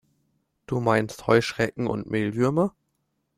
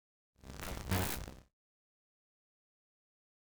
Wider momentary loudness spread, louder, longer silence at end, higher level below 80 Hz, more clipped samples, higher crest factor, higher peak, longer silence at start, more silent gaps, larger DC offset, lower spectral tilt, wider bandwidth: second, 6 LU vs 17 LU; first, -25 LUFS vs -39 LUFS; second, 0.7 s vs 2 s; about the same, -56 dBFS vs -54 dBFS; neither; second, 20 dB vs 28 dB; first, -4 dBFS vs -16 dBFS; first, 0.7 s vs 0.35 s; neither; neither; first, -6.5 dB/octave vs -4.5 dB/octave; second, 14.5 kHz vs over 20 kHz